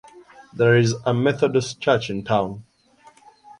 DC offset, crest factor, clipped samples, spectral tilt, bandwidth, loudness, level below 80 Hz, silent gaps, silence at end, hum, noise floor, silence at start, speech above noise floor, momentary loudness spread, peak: under 0.1%; 18 dB; under 0.1%; -6 dB/octave; 10.5 kHz; -21 LUFS; -56 dBFS; none; 1 s; none; -53 dBFS; 0.15 s; 33 dB; 11 LU; -4 dBFS